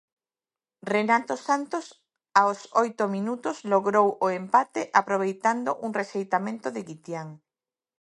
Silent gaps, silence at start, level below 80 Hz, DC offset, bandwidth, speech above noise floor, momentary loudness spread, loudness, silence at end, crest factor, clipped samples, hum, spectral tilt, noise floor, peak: none; 0.85 s; -80 dBFS; under 0.1%; 11.5 kHz; over 65 dB; 13 LU; -25 LUFS; 0.65 s; 24 dB; under 0.1%; none; -5 dB/octave; under -90 dBFS; -2 dBFS